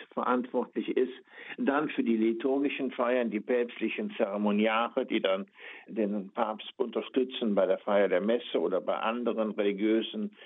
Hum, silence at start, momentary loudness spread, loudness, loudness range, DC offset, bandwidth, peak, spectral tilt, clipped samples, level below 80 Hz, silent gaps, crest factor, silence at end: none; 0 s; 7 LU; -30 LUFS; 2 LU; under 0.1%; 4 kHz; -12 dBFS; -9 dB/octave; under 0.1%; -84 dBFS; none; 18 dB; 0 s